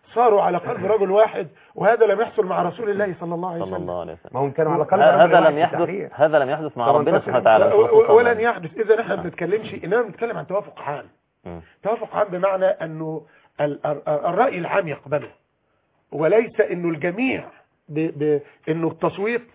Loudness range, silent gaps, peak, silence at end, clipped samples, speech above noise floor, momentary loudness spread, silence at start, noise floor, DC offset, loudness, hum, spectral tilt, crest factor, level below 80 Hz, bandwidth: 8 LU; none; -2 dBFS; 0.1 s; under 0.1%; 48 dB; 15 LU; 0.1 s; -68 dBFS; under 0.1%; -20 LUFS; none; -10 dB/octave; 18 dB; -60 dBFS; 4 kHz